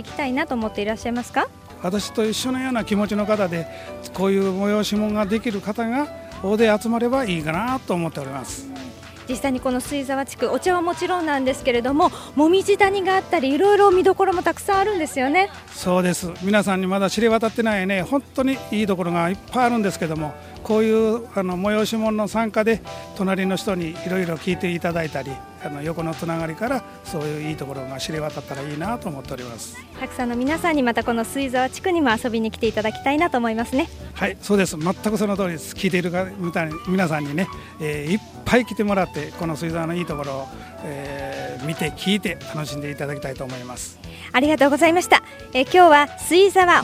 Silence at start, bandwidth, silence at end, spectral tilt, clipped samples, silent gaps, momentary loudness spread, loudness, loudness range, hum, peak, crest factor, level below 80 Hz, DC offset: 0 s; 16 kHz; 0 s; -5 dB/octave; under 0.1%; none; 13 LU; -21 LUFS; 9 LU; none; 0 dBFS; 22 dB; -48 dBFS; under 0.1%